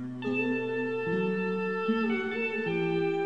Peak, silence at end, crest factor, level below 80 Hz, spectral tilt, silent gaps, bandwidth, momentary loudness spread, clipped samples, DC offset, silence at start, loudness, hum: -18 dBFS; 0 s; 12 dB; -74 dBFS; -8 dB/octave; none; 8.2 kHz; 2 LU; under 0.1%; 0.2%; 0 s; -30 LUFS; none